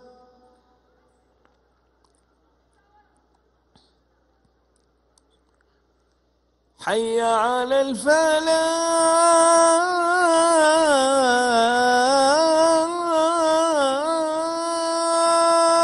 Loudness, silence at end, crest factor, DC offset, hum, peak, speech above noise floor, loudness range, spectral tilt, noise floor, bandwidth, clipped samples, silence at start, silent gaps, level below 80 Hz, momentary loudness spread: -18 LUFS; 0 s; 16 dB; under 0.1%; none; -4 dBFS; 47 dB; 8 LU; -1.5 dB/octave; -66 dBFS; 12 kHz; under 0.1%; 6.8 s; none; -62 dBFS; 7 LU